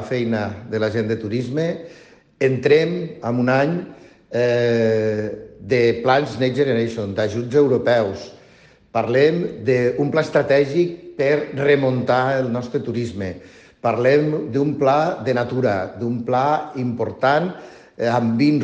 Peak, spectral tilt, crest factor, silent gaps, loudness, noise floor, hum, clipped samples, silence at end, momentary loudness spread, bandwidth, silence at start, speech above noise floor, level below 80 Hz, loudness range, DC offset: -4 dBFS; -7 dB/octave; 16 dB; none; -20 LUFS; -50 dBFS; none; under 0.1%; 0 s; 9 LU; 8.4 kHz; 0 s; 31 dB; -58 dBFS; 2 LU; under 0.1%